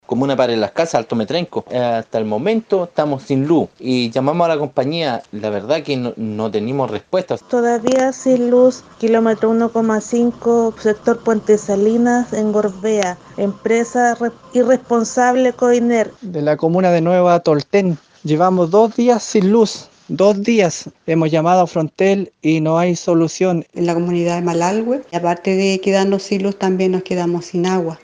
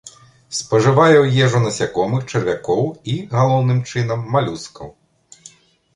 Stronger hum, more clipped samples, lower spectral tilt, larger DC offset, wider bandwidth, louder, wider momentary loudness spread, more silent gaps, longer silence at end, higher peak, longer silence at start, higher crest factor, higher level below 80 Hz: neither; neither; about the same, -6 dB/octave vs -6 dB/octave; neither; about the same, 10 kHz vs 11 kHz; about the same, -16 LUFS vs -17 LUFS; second, 7 LU vs 14 LU; neither; second, 0.1 s vs 1.05 s; about the same, 0 dBFS vs -2 dBFS; about the same, 0.1 s vs 0.05 s; about the same, 16 dB vs 16 dB; second, -58 dBFS vs -52 dBFS